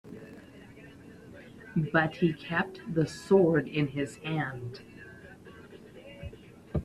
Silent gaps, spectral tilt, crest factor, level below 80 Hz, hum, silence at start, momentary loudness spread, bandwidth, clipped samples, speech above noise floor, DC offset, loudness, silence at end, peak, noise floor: none; -7 dB/octave; 22 dB; -56 dBFS; none; 0.05 s; 25 LU; 12.5 kHz; under 0.1%; 22 dB; under 0.1%; -29 LUFS; 0 s; -10 dBFS; -50 dBFS